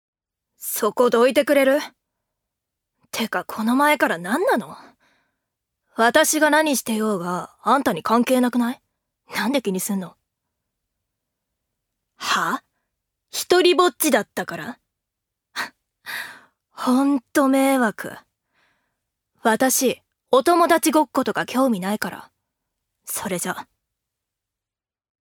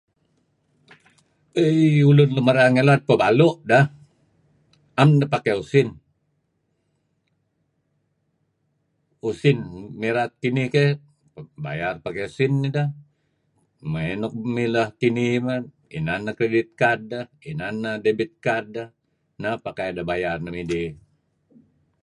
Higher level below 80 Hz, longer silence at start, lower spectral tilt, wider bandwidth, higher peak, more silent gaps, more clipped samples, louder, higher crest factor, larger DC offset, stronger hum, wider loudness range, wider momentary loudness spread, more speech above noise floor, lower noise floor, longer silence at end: second, -70 dBFS vs -56 dBFS; second, 0.6 s vs 1.55 s; second, -3.5 dB/octave vs -7.5 dB/octave; first, over 20 kHz vs 10.5 kHz; about the same, -2 dBFS vs -2 dBFS; neither; neither; about the same, -20 LUFS vs -21 LUFS; about the same, 20 dB vs 22 dB; neither; neither; second, 8 LU vs 11 LU; about the same, 16 LU vs 15 LU; first, over 70 dB vs 50 dB; first, under -90 dBFS vs -71 dBFS; first, 1.7 s vs 1.1 s